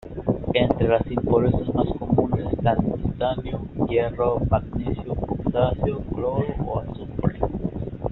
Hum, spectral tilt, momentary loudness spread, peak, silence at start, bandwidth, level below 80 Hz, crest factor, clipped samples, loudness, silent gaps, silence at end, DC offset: none; -7 dB/octave; 8 LU; -4 dBFS; 0.05 s; 4.2 kHz; -36 dBFS; 20 dB; under 0.1%; -24 LUFS; none; 0 s; under 0.1%